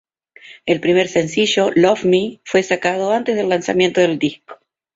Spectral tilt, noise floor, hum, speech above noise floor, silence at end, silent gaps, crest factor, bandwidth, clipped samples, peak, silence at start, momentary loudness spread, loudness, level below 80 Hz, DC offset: -4.5 dB/octave; -44 dBFS; none; 28 dB; 0.4 s; none; 16 dB; 7.8 kHz; under 0.1%; -2 dBFS; 0.45 s; 5 LU; -16 LUFS; -58 dBFS; under 0.1%